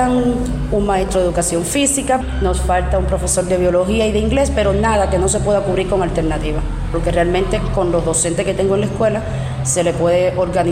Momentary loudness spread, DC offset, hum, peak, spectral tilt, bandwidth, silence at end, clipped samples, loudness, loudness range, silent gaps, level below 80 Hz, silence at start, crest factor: 4 LU; under 0.1%; none; -4 dBFS; -5 dB/octave; 15.5 kHz; 0 s; under 0.1%; -16 LUFS; 2 LU; none; -24 dBFS; 0 s; 12 dB